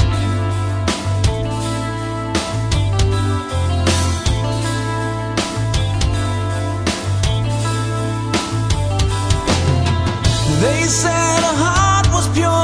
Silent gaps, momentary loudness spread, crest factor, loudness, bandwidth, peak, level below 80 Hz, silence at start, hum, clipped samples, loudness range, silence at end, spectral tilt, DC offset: none; 6 LU; 16 dB; -17 LUFS; 11 kHz; 0 dBFS; -26 dBFS; 0 s; none; under 0.1%; 4 LU; 0 s; -4.5 dB/octave; under 0.1%